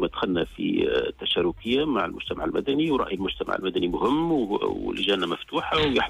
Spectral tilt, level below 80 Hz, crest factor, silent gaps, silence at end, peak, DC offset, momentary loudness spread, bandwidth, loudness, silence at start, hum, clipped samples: -6 dB/octave; -48 dBFS; 14 dB; none; 0 s; -12 dBFS; under 0.1%; 4 LU; 13 kHz; -25 LUFS; 0 s; none; under 0.1%